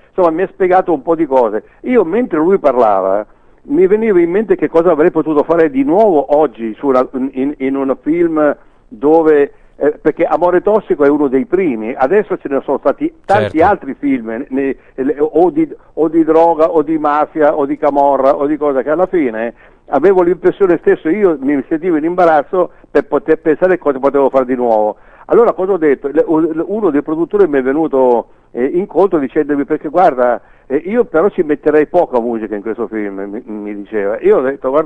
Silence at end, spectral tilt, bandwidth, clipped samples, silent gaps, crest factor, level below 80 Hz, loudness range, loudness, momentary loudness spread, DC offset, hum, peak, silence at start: 0 s; -8.5 dB/octave; 8.2 kHz; under 0.1%; none; 12 dB; -44 dBFS; 2 LU; -13 LUFS; 8 LU; under 0.1%; none; 0 dBFS; 0.2 s